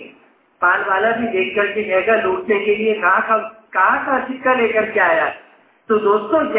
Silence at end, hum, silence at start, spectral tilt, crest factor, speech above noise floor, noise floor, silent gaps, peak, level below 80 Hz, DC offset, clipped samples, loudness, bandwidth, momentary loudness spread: 0 s; none; 0 s; -8 dB/octave; 16 dB; 35 dB; -51 dBFS; none; -2 dBFS; -58 dBFS; under 0.1%; under 0.1%; -17 LUFS; 4 kHz; 4 LU